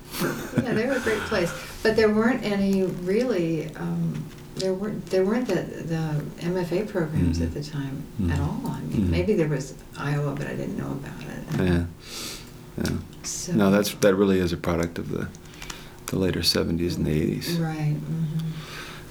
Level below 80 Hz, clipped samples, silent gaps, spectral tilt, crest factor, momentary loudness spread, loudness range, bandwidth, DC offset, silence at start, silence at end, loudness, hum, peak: -44 dBFS; under 0.1%; none; -5.5 dB/octave; 20 dB; 13 LU; 4 LU; over 20 kHz; under 0.1%; 0 s; 0 s; -26 LUFS; none; -6 dBFS